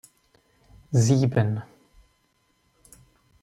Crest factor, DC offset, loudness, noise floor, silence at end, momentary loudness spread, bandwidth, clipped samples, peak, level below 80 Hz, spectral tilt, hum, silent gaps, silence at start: 18 dB; under 0.1%; -23 LUFS; -68 dBFS; 1.8 s; 8 LU; 12.5 kHz; under 0.1%; -8 dBFS; -60 dBFS; -6.5 dB/octave; none; none; 0.9 s